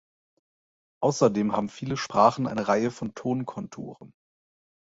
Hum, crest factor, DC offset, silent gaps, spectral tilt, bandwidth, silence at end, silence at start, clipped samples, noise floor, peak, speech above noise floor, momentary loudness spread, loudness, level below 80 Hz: none; 22 dB; under 0.1%; none; -6 dB/octave; 8 kHz; 0.9 s; 1 s; under 0.1%; under -90 dBFS; -6 dBFS; over 64 dB; 16 LU; -26 LUFS; -64 dBFS